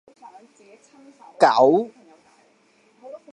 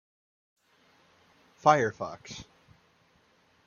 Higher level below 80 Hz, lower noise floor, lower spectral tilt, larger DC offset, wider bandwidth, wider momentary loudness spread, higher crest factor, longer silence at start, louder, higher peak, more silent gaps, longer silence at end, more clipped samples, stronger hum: second, -80 dBFS vs -70 dBFS; second, -60 dBFS vs -66 dBFS; about the same, -5.5 dB/octave vs -5 dB/octave; neither; first, 10.5 kHz vs 7.2 kHz; first, 27 LU vs 21 LU; about the same, 22 dB vs 26 dB; second, 1.4 s vs 1.65 s; first, -18 LUFS vs -27 LUFS; first, -2 dBFS vs -6 dBFS; neither; second, 0.2 s vs 1.25 s; neither; neither